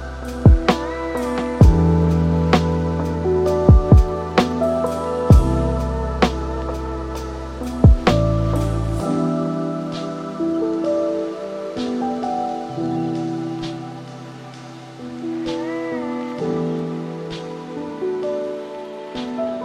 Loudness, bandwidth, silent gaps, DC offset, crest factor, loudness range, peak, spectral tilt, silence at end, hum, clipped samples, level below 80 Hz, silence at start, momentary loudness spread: -20 LUFS; 11.5 kHz; none; under 0.1%; 18 dB; 10 LU; 0 dBFS; -7.5 dB/octave; 0 s; none; under 0.1%; -24 dBFS; 0 s; 16 LU